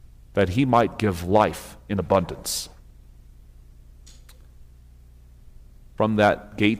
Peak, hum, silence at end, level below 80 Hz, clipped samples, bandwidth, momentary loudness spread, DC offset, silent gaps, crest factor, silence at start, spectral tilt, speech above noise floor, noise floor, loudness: -4 dBFS; 60 Hz at -50 dBFS; 0 s; -46 dBFS; under 0.1%; 16 kHz; 10 LU; under 0.1%; none; 20 dB; 0.35 s; -5.5 dB/octave; 27 dB; -48 dBFS; -23 LUFS